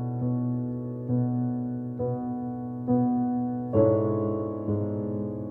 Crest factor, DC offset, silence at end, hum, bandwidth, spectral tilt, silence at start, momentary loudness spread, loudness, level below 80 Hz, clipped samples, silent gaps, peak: 18 dB; under 0.1%; 0 s; none; 2.2 kHz; -13.5 dB/octave; 0 s; 9 LU; -28 LUFS; -58 dBFS; under 0.1%; none; -10 dBFS